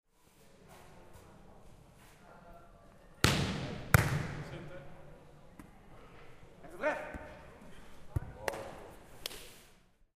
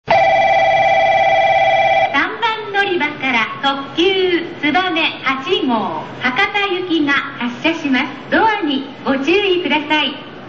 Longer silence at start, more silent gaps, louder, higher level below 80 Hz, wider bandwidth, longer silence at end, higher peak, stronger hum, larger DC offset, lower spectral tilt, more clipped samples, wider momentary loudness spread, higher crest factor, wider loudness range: first, 0.4 s vs 0.05 s; neither; second, -35 LUFS vs -15 LUFS; about the same, -50 dBFS vs -50 dBFS; first, 15.5 kHz vs 7.6 kHz; first, 0.5 s vs 0 s; about the same, -4 dBFS vs -2 dBFS; neither; second, under 0.1% vs 0.4%; about the same, -4.5 dB/octave vs -4.5 dB/octave; neither; first, 28 LU vs 6 LU; first, 36 dB vs 12 dB; first, 9 LU vs 3 LU